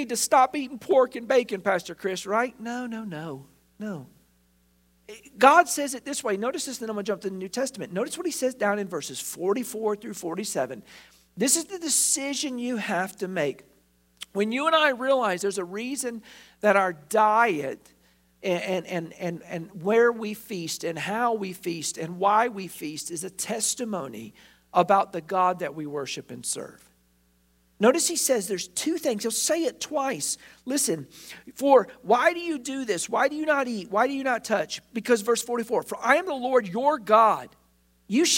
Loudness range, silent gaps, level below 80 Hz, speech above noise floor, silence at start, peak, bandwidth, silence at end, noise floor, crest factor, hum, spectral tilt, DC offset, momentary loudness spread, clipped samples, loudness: 5 LU; none; -70 dBFS; 39 dB; 0 s; -2 dBFS; 16.5 kHz; 0 s; -65 dBFS; 24 dB; none; -3 dB/octave; under 0.1%; 13 LU; under 0.1%; -25 LUFS